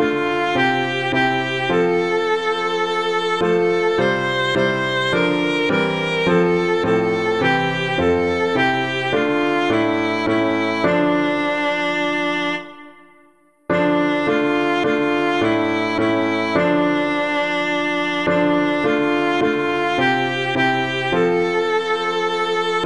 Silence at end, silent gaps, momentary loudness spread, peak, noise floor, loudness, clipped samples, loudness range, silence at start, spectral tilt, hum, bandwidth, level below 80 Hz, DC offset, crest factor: 0 s; none; 2 LU; -4 dBFS; -54 dBFS; -18 LUFS; under 0.1%; 2 LU; 0 s; -5.5 dB/octave; none; 11 kHz; -52 dBFS; 0.4%; 14 dB